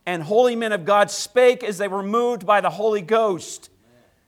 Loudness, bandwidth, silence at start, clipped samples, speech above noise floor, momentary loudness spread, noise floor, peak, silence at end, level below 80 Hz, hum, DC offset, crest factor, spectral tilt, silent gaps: -20 LUFS; 15 kHz; 0.05 s; under 0.1%; 38 dB; 8 LU; -57 dBFS; -4 dBFS; 0.6 s; -70 dBFS; none; under 0.1%; 16 dB; -4 dB/octave; none